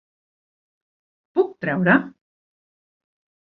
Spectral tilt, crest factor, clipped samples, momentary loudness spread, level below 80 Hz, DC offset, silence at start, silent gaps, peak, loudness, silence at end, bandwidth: -10 dB/octave; 22 dB; under 0.1%; 9 LU; -66 dBFS; under 0.1%; 1.35 s; none; -4 dBFS; -21 LUFS; 1.4 s; 4.8 kHz